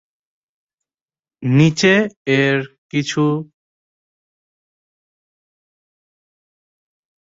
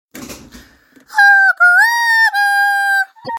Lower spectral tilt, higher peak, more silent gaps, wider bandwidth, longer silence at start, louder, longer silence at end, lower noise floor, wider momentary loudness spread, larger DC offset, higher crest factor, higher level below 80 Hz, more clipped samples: first, -5.5 dB/octave vs 0 dB/octave; about the same, -2 dBFS vs 0 dBFS; first, 2.16-2.25 s, 2.78-2.89 s vs none; second, 7.8 kHz vs 17 kHz; first, 1.4 s vs 0.15 s; second, -17 LUFS vs -10 LUFS; first, 3.95 s vs 0 s; first, under -90 dBFS vs -46 dBFS; first, 11 LU vs 8 LU; neither; first, 20 dB vs 12 dB; about the same, -58 dBFS vs -54 dBFS; neither